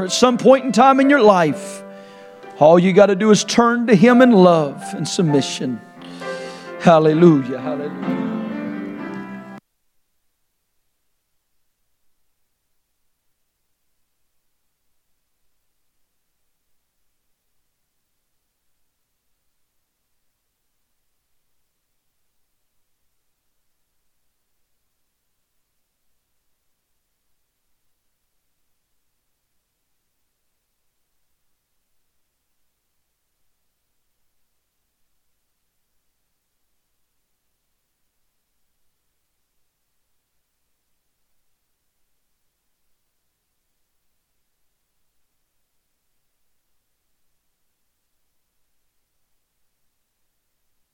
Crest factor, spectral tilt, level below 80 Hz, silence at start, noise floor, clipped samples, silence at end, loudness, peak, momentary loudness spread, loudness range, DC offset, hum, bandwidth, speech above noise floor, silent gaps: 22 dB; -5.5 dB/octave; -68 dBFS; 0 s; -71 dBFS; under 0.1%; 41.35 s; -14 LUFS; 0 dBFS; 19 LU; 16 LU; under 0.1%; none; 13.5 kHz; 58 dB; none